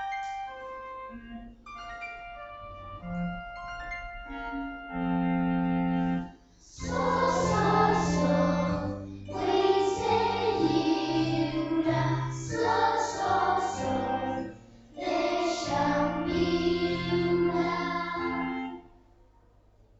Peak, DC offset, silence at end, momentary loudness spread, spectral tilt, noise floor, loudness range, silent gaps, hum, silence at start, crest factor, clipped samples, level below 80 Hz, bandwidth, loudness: -12 dBFS; under 0.1%; 1.15 s; 16 LU; -6 dB/octave; -60 dBFS; 12 LU; none; none; 0 s; 16 dB; under 0.1%; -50 dBFS; 8.2 kHz; -28 LUFS